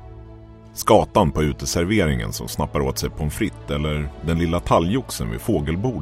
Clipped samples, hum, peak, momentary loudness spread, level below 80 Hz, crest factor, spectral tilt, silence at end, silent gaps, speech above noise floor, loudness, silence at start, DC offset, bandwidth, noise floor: under 0.1%; none; 0 dBFS; 9 LU; -34 dBFS; 20 dB; -5.5 dB/octave; 0 s; none; 21 dB; -21 LUFS; 0 s; under 0.1%; 16 kHz; -41 dBFS